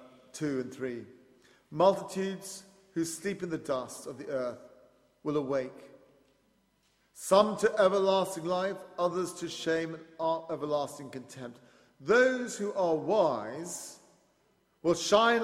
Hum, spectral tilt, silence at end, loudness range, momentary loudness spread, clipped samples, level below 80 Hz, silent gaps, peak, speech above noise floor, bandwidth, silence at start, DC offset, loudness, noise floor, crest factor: none; -4 dB/octave; 0 s; 7 LU; 18 LU; under 0.1%; -72 dBFS; none; -8 dBFS; 41 dB; 15.5 kHz; 0 s; under 0.1%; -30 LUFS; -71 dBFS; 22 dB